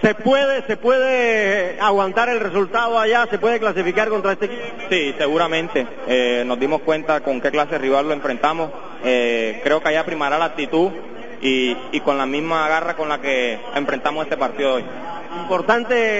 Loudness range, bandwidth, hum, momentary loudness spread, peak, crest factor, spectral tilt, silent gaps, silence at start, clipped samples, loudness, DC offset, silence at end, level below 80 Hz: 3 LU; 7.8 kHz; none; 7 LU; -2 dBFS; 18 dB; -2 dB/octave; none; 0 s; under 0.1%; -19 LUFS; 2%; 0 s; -56 dBFS